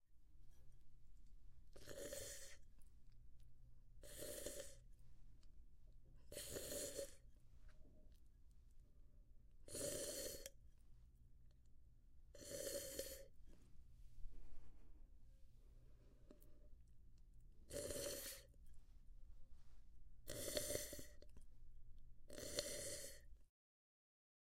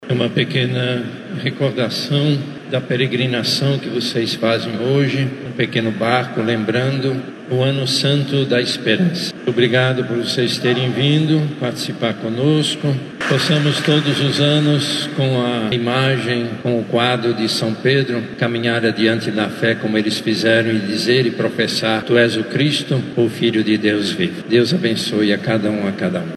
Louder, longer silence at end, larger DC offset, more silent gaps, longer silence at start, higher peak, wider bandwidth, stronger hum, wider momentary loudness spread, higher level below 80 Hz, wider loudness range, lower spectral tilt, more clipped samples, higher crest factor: second, -51 LUFS vs -17 LUFS; first, 1 s vs 0 s; neither; neither; about the same, 0 s vs 0 s; second, -26 dBFS vs 0 dBFS; first, 16 kHz vs 13.5 kHz; neither; first, 22 LU vs 6 LU; about the same, -64 dBFS vs -64 dBFS; first, 8 LU vs 2 LU; second, -2.5 dB/octave vs -5.5 dB/octave; neither; first, 28 dB vs 16 dB